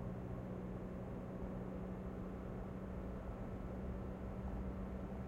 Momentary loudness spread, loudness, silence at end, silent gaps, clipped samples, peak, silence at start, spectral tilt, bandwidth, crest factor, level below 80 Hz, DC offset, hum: 2 LU; -47 LUFS; 0 s; none; under 0.1%; -34 dBFS; 0 s; -9.5 dB/octave; 8.2 kHz; 12 dB; -52 dBFS; under 0.1%; none